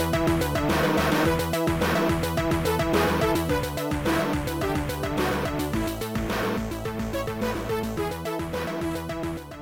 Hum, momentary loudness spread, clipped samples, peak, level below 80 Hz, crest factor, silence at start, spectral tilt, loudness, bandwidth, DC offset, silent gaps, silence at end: none; 7 LU; under 0.1%; -10 dBFS; -38 dBFS; 14 dB; 0 s; -5.5 dB/octave; -26 LUFS; 17 kHz; 0.1%; none; 0 s